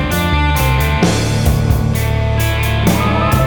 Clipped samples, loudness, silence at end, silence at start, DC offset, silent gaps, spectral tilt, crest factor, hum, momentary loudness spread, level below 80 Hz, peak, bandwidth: under 0.1%; -14 LUFS; 0 s; 0 s; under 0.1%; none; -5.5 dB/octave; 14 dB; none; 2 LU; -20 dBFS; 0 dBFS; over 20 kHz